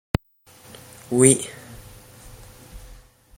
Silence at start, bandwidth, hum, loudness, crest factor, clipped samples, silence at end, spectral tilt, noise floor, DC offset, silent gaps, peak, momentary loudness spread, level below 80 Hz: 1.1 s; 16.5 kHz; none; -19 LUFS; 26 dB; under 0.1%; 0.6 s; -4.5 dB/octave; -53 dBFS; under 0.1%; none; 0 dBFS; 28 LU; -46 dBFS